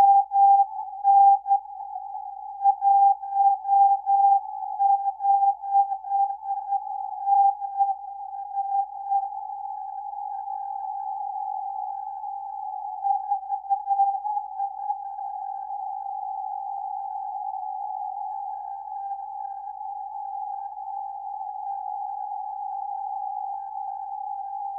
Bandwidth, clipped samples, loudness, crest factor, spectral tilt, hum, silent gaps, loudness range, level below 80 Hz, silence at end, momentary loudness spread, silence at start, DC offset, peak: 1.7 kHz; under 0.1%; -26 LUFS; 16 dB; -3.5 dB/octave; none; none; 12 LU; -72 dBFS; 0 s; 15 LU; 0 s; under 0.1%; -10 dBFS